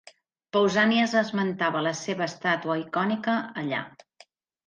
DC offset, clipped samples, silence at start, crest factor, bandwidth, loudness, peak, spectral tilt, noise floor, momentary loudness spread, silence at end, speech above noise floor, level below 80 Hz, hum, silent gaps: under 0.1%; under 0.1%; 0.55 s; 18 dB; 9.2 kHz; -26 LUFS; -10 dBFS; -5 dB/octave; -58 dBFS; 9 LU; 0.8 s; 33 dB; -72 dBFS; none; none